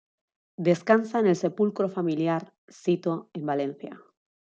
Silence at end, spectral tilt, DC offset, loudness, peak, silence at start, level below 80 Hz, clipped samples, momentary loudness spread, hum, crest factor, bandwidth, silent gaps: 0.6 s; -7 dB/octave; under 0.1%; -26 LUFS; -6 dBFS; 0.6 s; -76 dBFS; under 0.1%; 10 LU; none; 22 dB; 8.2 kHz; 2.58-2.68 s